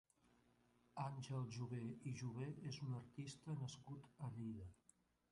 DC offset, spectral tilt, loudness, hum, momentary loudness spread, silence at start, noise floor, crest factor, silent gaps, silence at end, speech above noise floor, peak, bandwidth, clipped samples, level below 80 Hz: under 0.1%; -6.5 dB/octave; -51 LUFS; 60 Hz at -70 dBFS; 8 LU; 0.95 s; -78 dBFS; 18 dB; none; 0.55 s; 28 dB; -34 dBFS; 11 kHz; under 0.1%; -76 dBFS